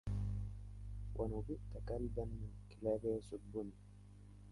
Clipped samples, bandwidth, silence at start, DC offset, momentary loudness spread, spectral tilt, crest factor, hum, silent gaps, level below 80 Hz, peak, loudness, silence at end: under 0.1%; 11.5 kHz; 0.05 s; under 0.1%; 19 LU; -9 dB/octave; 18 dB; 50 Hz at -50 dBFS; none; -50 dBFS; -26 dBFS; -45 LUFS; 0 s